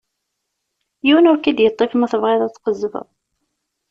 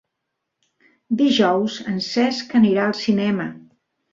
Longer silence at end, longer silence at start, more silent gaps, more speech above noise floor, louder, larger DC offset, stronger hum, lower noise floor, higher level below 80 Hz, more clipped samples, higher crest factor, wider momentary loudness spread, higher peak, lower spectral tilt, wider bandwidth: first, 0.9 s vs 0.55 s; about the same, 1.05 s vs 1.1 s; neither; about the same, 60 dB vs 60 dB; first, -16 LUFS vs -19 LUFS; neither; neither; about the same, -76 dBFS vs -79 dBFS; about the same, -62 dBFS vs -64 dBFS; neither; about the same, 16 dB vs 16 dB; about the same, 11 LU vs 9 LU; about the same, -2 dBFS vs -4 dBFS; about the same, -5.5 dB/octave vs -5.5 dB/octave; about the same, 7.4 kHz vs 7.6 kHz